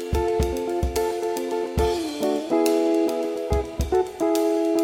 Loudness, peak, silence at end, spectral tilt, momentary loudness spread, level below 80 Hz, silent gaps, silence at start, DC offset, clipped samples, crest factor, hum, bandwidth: -24 LUFS; -8 dBFS; 0 s; -6 dB/octave; 5 LU; -34 dBFS; none; 0 s; under 0.1%; under 0.1%; 16 dB; none; 19.5 kHz